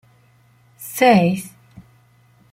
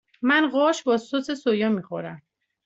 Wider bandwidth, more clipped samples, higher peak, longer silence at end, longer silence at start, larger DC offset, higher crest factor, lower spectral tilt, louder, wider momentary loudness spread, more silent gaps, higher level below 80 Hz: first, 16.5 kHz vs 8 kHz; neither; first, -2 dBFS vs -6 dBFS; first, 1.05 s vs 0.45 s; first, 0.8 s vs 0.2 s; neither; about the same, 20 dB vs 18 dB; about the same, -5.5 dB/octave vs -5 dB/octave; first, -16 LUFS vs -23 LUFS; first, 23 LU vs 14 LU; neither; first, -60 dBFS vs -70 dBFS